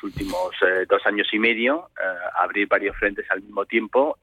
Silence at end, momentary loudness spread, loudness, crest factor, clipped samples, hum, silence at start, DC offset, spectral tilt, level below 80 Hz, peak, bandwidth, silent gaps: 0.1 s; 8 LU; -22 LUFS; 16 dB; under 0.1%; none; 0.05 s; under 0.1%; -5 dB/octave; -48 dBFS; -6 dBFS; 15 kHz; none